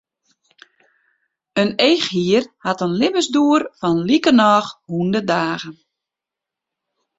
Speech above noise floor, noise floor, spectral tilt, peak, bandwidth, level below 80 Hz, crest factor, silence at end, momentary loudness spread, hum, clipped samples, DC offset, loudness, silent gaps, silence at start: 69 dB; -86 dBFS; -5 dB/octave; -2 dBFS; 8 kHz; -60 dBFS; 18 dB; 1.45 s; 11 LU; none; under 0.1%; under 0.1%; -17 LUFS; none; 1.55 s